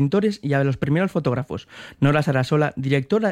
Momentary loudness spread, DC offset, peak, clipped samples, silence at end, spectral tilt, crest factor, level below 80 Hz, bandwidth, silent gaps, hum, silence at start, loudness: 8 LU; under 0.1%; -6 dBFS; under 0.1%; 0 s; -7.5 dB/octave; 16 dB; -52 dBFS; 11 kHz; none; none; 0 s; -21 LUFS